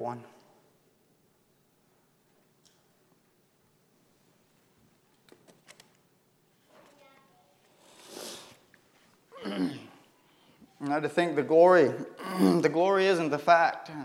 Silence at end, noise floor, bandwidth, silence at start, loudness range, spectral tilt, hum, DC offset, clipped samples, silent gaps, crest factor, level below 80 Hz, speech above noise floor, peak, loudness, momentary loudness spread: 0 s; -68 dBFS; 16.5 kHz; 0 s; 26 LU; -6 dB/octave; none; under 0.1%; under 0.1%; none; 24 dB; -84 dBFS; 43 dB; -8 dBFS; -25 LUFS; 22 LU